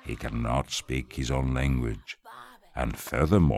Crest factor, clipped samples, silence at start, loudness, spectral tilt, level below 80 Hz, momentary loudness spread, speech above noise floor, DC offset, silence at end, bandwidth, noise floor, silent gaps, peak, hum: 20 dB; under 0.1%; 0.05 s; -29 LUFS; -6 dB/octave; -36 dBFS; 16 LU; 22 dB; under 0.1%; 0 s; 16 kHz; -49 dBFS; none; -8 dBFS; none